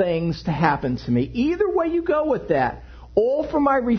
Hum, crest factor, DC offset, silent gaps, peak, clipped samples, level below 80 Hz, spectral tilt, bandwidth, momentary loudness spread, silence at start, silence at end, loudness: none; 18 dB; under 0.1%; none; -4 dBFS; under 0.1%; -42 dBFS; -8.5 dB/octave; 6.4 kHz; 4 LU; 0 s; 0 s; -22 LUFS